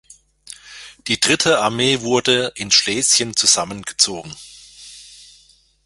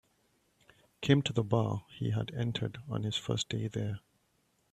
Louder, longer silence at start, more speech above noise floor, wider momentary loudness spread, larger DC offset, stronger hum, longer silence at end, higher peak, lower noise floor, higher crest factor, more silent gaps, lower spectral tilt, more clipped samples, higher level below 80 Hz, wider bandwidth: first, -16 LUFS vs -33 LUFS; second, 0.5 s vs 1 s; second, 36 dB vs 42 dB; first, 23 LU vs 9 LU; neither; neither; about the same, 0.7 s vs 0.75 s; first, 0 dBFS vs -10 dBFS; second, -53 dBFS vs -74 dBFS; about the same, 20 dB vs 24 dB; neither; second, -1.5 dB/octave vs -6 dB/octave; neither; first, -54 dBFS vs -62 dBFS; about the same, 12 kHz vs 11 kHz